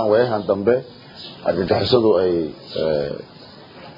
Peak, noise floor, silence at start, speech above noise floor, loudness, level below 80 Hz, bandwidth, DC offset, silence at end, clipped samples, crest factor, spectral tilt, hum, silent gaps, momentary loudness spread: -2 dBFS; -41 dBFS; 0 s; 22 dB; -20 LUFS; -52 dBFS; 5.4 kHz; under 0.1%; 0.05 s; under 0.1%; 18 dB; -8 dB/octave; none; none; 20 LU